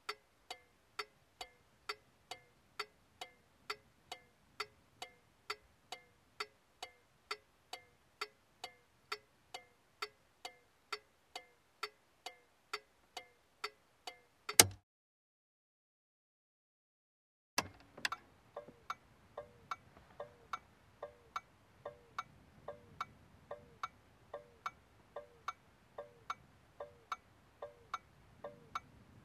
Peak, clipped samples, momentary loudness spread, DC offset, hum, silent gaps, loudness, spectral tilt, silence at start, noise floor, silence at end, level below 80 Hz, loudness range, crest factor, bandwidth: -4 dBFS; under 0.1%; 11 LU; under 0.1%; none; 14.83-17.57 s; -43 LUFS; -0.5 dB/octave; 0.1 s; -57 dBFS; 0.2 s; -76 dBFS; 16 LU; 42 dB; 15 kHz